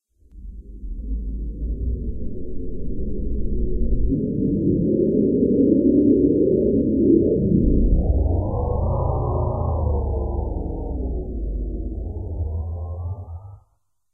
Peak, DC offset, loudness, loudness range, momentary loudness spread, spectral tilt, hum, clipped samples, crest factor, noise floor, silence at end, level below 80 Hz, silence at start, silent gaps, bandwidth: -4 dBFS; under 0.1%; -22 LUFS; 12 LU; 16 LU; -16.5 dB/octave; none; under 0.1%; 16 dB; -68 dBFS; 0.55 s; -26 dBFS; 0.35 s; none; 1.3 kHz